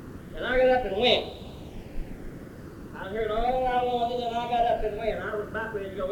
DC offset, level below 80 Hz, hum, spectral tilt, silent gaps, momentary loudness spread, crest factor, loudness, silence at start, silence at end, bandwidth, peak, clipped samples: under 0.1%; -42 dBFS; none; -5.5 dB/octave; none; 19 LU; 20 dB; -27 LUFS; 0 s; 0 s; 18.5 kHz; -8 dBFS; under 0.1%